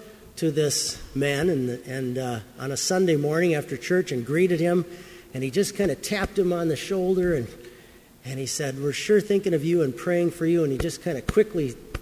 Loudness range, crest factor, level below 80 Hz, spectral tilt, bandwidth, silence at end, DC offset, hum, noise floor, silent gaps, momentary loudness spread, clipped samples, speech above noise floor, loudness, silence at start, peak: 2 LU; 18 dB; -48 dBFS; -5 dB/octave; 16 kHz; 0 s; under 0.1%; none; -50 dBFS; none; 10 LU; under 0.1%; 26 dB; -25 LUFS; 0 s; -8 dBFS